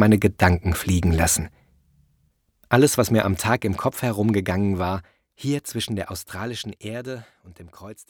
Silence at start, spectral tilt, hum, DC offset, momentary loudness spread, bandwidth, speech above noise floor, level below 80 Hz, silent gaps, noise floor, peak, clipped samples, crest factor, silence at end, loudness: 0 s; -5 dB/octave; none; under 0.1%; 15 LU; over 20 kHz; 44 dB; -40 dBFS; none; -66 dBFS; -2 dBFS; under 0.1%; 20 dB; 0.1 s; -22 LUFS